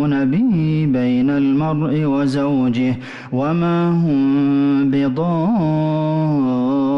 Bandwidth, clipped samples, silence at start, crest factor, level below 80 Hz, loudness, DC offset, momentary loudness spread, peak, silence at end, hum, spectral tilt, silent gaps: 7 kHz; under 0.1%; 0 s; 6 dB; -50 dBFS; -17 LUFS; under 0.1%; 3 LU; -10 dBFS; 0 s; none; -9 dB/octave; none